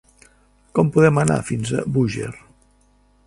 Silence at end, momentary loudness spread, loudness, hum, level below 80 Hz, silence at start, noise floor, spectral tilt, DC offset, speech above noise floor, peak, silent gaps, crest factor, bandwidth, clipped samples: 0.9 s; 11 LU; -19 LUFS; 50 Hz at -40 dBFS; -48 dBFS; 0.75 s; -57 dBFS; -6.5 dB/octave; under 0.1%; 39 dB; -2 dBFS; none; 20 dB; 11.5 kHz; under 0.1%